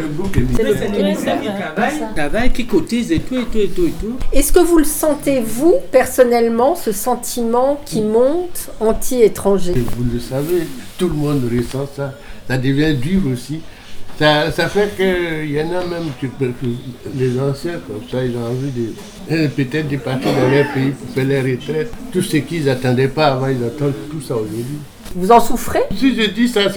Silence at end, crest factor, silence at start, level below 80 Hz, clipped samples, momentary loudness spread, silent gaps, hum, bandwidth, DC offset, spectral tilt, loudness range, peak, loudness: 0 s; 16 dB; 0 s; -28 dBFS; under 0.1%; 11 LU; none; none; over 20 kHz; under 0.1%; -5.5 dB/octave; 5 LU; 0 dBFS; -17 LUFS